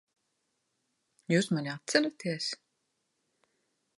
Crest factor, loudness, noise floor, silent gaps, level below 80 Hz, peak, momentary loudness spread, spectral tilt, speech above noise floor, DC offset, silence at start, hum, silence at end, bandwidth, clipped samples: 24 dB; -31 LUFS; -80 dBFS; none; -84 dBFS; -10 dBFS; 11 LU; -4.5 dB/octave; 50 dB; under 0.1%; 1.3 s; none; 1.4 s; 11.5 kHz; under 0.1%